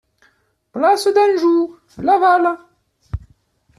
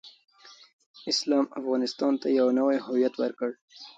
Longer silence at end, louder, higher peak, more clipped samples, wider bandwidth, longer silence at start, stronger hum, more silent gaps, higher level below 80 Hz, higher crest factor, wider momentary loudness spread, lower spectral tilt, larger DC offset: first, 0.6 s vs 0.05 s; first, -15 LUFS vs -26 LUFS; first, -4 dBFS vs -12 dBFS; neither; first, 13 kHz vs 9 kHz; first, 0.75 s vs 0.05 s; neither; second, none vs 0.73-0.79 s, 0.86-0.94 s, 3.61-3.68 s; first, -44 dBFS vs -80 dBFS; about the same, 14 dB vs 16 dB; first, 19 LU vs 11 LU; first, -5.5 dB/octave vs -3.5 dB/octave; neither